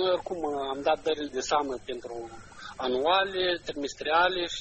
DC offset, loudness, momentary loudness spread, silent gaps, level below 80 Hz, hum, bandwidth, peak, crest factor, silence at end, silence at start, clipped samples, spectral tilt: under 0.1%; -28 LUFS; 15 LU; none; -56 dBFS; none; 8.4 kHz; -10 dBFS; 18 dB; 0 s; 0 s; under 0.1%; -3 dB/octave